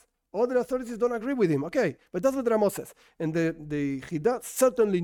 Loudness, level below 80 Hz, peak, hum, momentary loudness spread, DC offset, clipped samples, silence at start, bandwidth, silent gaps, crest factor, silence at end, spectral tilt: -27 LUFS; -60 dBFS; -10 dBFS; none; 7 LU; under 0.1%; under 0.1%; 0.35 s; 17 kHz; none; 16 dB; 0 s; -6 dB/octave